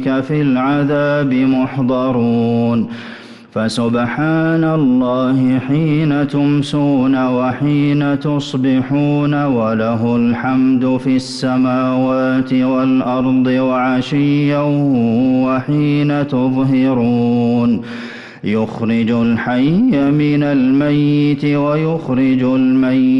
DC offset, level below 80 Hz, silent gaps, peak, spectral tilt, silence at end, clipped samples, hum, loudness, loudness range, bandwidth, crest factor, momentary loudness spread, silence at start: under 0.1%; -48 dBFS; none; -6 dBFS; -8 dB/octave; 0 s; under 0.1%; none; -15 LUFS; 2 LU; 10.5 kHz; 8 dB; 4 LU; 0 s